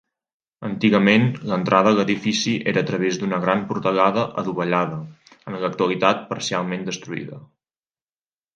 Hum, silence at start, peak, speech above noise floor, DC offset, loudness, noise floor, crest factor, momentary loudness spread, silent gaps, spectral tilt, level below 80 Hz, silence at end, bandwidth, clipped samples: none; 0.6 s; 0 dBFS; over 69 dB; under 0.1%; -21 LUFS; under -90 dBFS; 20 dB; 15 LU; none; -5.5 dB/octave; -62 dBFS; 1.1 s; 9.2 kHz; under 0.1%